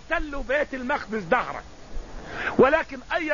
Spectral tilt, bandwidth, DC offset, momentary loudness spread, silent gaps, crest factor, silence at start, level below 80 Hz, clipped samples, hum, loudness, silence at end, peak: -5.5 dB/octave; 7.4 kHz; 0.4%; 21 LU; none; 20 dB; 0 s; -40 dBFS; under 0.1%; none; -25 LUFS; 0 s; -6 dBFS